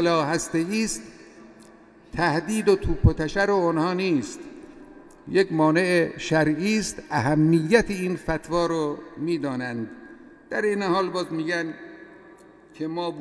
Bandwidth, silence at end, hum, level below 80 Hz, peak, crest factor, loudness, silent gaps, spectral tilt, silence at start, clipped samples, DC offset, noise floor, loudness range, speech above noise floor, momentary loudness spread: 11 kHz; 0 s; none; -40 dBFS; -4 dBFS; 20 dB; -24 LUFS; none; -5.5 dB/octave; 0 s; under 0.1%; under 0.1%; -50 dBFS; 6 LU; 27 dB; 14 LU